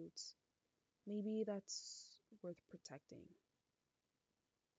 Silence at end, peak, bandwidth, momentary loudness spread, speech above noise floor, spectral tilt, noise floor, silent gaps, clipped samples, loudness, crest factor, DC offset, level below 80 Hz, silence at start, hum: 1.45 s; -32 dBFS; 9 kHz; 18 LU; over 41 dB; -4.5 dB/octave; under -90 dBFS; none; under 0.1%; -50 LUFS; 20 dB; under 0.1%; under -90 dBFS; 0 s; none